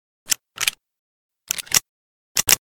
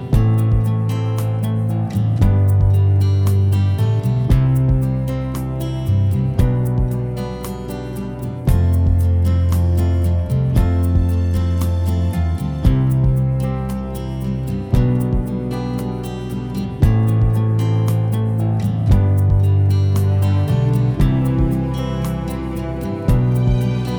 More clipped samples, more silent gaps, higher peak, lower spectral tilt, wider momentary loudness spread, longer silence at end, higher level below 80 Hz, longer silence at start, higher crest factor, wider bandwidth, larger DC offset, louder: neither; first, 0.99-1.29 s, 1.89-2.35 s vs none; about the same, 0 dBFS vs -2 dBFS; second, 1 dB/octave vs -8.5 dB/octave; about the same, 7 LU vs 9 LU; about the same, 0.05 s vs 0 s; second, -54 dBFS vs -26 dBFS; first, 0.3 s vs 0 s; first, 26 dB vs 14 dB; about the same, over 20 kHz vs over 20 kHz; neither; second, -21 LUFS vs -18 LUFS